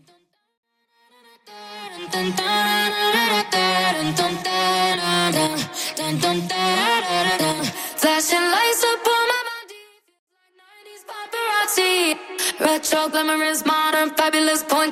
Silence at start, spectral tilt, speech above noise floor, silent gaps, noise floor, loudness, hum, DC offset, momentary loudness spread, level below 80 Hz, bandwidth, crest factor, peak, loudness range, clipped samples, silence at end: 1.45 s; -2.5 dB/octave; 41 dB; 10.19-10.27 s; -61 dBFS; -19 LUFS; none; under 0.1%; 8 LU; -64 dBFS; 16 kHz; 18 dB; -4 dBFS; 4 LU; under 0.1%; 0 s